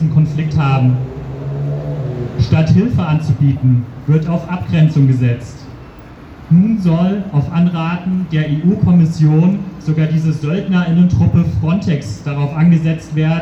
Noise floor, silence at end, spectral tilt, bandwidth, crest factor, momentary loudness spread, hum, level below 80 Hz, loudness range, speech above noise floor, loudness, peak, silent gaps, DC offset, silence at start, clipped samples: -35 dBFS; 0 s; -9 dB/octave; 8 kHz; 14 dB; 9 LU; none; -36 dBFS; 2 LU; 22 dB; -14 LUFS; 0 dBFS; none; under 0.1%; 0 s; under 0.1%